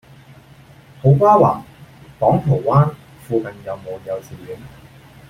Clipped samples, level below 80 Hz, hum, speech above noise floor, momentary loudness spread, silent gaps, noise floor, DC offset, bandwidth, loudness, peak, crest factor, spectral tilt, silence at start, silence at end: under 0.1%; -48 dBFS; none; 29 dB; 21 LU; none; -45 dBFS; under 0.1%; 9.6 kHz; -17 LUFS; 0 dBFS; 18 dB; -9.5 dB/octave; 1.05 s; 0.6 s